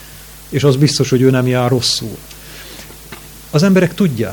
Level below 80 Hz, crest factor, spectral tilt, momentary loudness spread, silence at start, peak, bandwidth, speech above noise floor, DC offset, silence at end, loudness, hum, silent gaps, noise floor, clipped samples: -42 dBFS; 16 dB; -5.5 dB/octave; 21 LU; 0 s; 0 dBFS; 19.5 kHz; 23 dB; under 0.1%; 0 s; -14 LUFS; none; none; -36 dBFS; under 0.1%